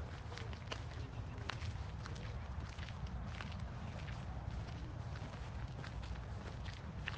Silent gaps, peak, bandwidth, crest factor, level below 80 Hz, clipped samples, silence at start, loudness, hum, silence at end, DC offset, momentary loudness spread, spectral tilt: none; -20 dBFS; 9.2 kHz; 24 dB; -50 dBFS; under 0.1%; 0 s; -47 LUFS; none; 0 s; under 0.1%; 2 LU; -6 dB/octave